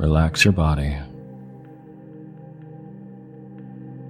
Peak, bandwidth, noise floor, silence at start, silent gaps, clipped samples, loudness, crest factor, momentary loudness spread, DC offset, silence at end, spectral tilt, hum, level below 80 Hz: -2 dBFS; 15 kHz; -42 dBFS; 0 s; none; under 0.1%; -19 LUFS; 22 dB; 25 LU; under 0.1%; 0 s; -5.5 dB/octave; none; -32 dBFS